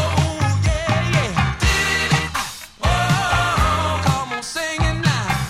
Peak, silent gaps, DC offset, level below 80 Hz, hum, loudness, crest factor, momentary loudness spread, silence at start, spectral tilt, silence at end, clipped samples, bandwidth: -2 dBFS; none; under 0.1%; -28 dBFS; none; -19 LUFS; 16 dB; 6 LU; 0 s; -4.5 dB/octave; 0 s; under 0.1%; 16 kHz